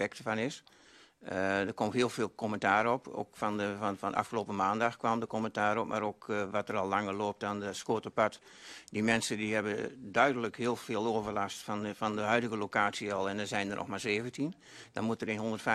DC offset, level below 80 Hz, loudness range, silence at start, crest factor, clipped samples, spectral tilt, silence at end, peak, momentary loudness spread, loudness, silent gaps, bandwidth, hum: under 0.1%; -70 dBFS; 1 LU; 0 s; 20 dB; under 0.1%; -4.5 dB/octave; 0 s; -12 dBFS; 8 LU; -33 LUFS; none; 13 kHz; none